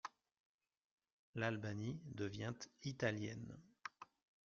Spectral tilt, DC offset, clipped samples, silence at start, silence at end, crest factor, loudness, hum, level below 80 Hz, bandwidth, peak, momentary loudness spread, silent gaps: -5 dB/octave; under 0.1%; under 0.1%; 0.05 s; 0.45 s; 22 dB; -47 LUFS; none; -76 dBFS; 7.4 kHz; -26 dBFS; 14 LU; 0.40-0.59 s, 0.77-0.98 s, 1.12-1.33 s